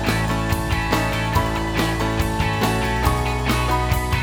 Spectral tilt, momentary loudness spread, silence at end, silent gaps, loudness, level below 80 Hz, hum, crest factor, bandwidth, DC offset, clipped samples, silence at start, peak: -5 dB/octave; 2 LU; 0 s; none; -21 LUFS; -28 dBFS; none; 18 dB; over 20 kHz; under 0.1%; under 0.1%; 0 s; -2 dBFS